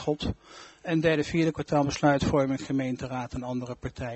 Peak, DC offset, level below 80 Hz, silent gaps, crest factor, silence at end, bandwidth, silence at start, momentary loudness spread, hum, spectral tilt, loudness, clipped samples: -8 dBFS; under 0.1%; -48 dBFS; none; 20 dB; 0 s; 8.2 kHz; 0 s; 12 LU; none; -6 dB/octave; -28 LUFS; under 0.1%